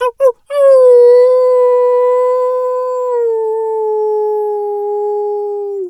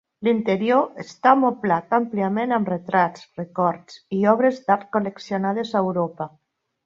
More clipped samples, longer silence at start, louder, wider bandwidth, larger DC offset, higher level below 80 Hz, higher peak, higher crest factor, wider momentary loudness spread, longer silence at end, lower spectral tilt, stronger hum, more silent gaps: neither; second, 0 s vs 0.2 s; first, -12 LUFS vs -22 LUFS; first, 11.5 kHz vs 7.4 kHz; neither; about the same, -66 dBFS vs -68 dBFS; about the same, 0 dBFS vs -2 dBFS; second, 10 dB vs 20 dB; about the same, 11 LU vs 11 LU; second, 0 s vs 0.6 s; second, -2.5 dB/octave vs -7.5 dB/octave; neither; neither